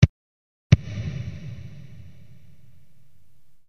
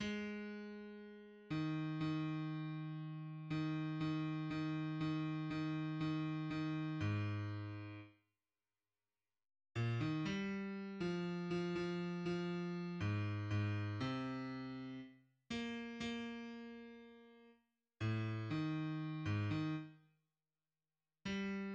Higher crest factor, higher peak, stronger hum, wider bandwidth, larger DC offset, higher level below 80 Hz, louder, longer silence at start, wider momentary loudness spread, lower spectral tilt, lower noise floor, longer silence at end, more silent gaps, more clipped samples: first, 26 dB vs 14 dB; first, 0 dBFS vs -28 dBFS; neither; second, 6.8 kHz vs 8.2 kHz; first, 0.9% vs under 0.1%; first, -40 dBFS vs -72 dBFS; first, -24 LUFS vs -43 LUFS; about the same, 0 s vs 0 s; first, 24 LU vs 11 LU; about the same, -7 dB/octave vs -7.5 dB/octave; second, -62 dBFS vs under -90 dBFS; first, 2 s vs 0 s; first, 0.09-0.70 s vs none; neither